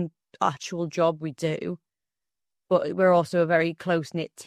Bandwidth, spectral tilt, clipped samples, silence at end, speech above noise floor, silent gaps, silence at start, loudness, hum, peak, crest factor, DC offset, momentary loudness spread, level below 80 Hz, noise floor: 13.5 kHz; -6 dB/octave; under 0.1%; 0.05 s; over 66 dB; none; 0 s; -25 LUFS; none; -8 dBFS; 18 dB; under 0.1%; 12 LU; -70 dBFS; under -90 dBFS